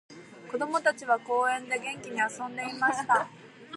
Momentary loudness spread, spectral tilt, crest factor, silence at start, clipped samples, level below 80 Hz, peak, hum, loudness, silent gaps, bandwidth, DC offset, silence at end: 9 LU; -3 dB/octave; 18 dB; 0.1 s; under 0.1%; -82 dBFS; -12 dBFS; none; -29 LUFS; none; 11.5 kHz; under 0.1%; 0 s